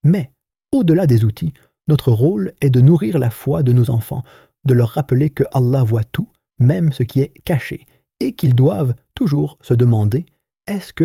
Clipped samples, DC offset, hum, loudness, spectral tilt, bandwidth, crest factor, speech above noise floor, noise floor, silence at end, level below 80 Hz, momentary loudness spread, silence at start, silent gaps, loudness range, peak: under 0.1%; under 0.1%; none; -17 LUFS; -8.5 dB/octave; 15.5 kHz; 14 dB; 24 dB; -40 dBFS; 0 s; -46 dBFS; 13 LU; 0.05 s; none; 3 LU; -2 dBFS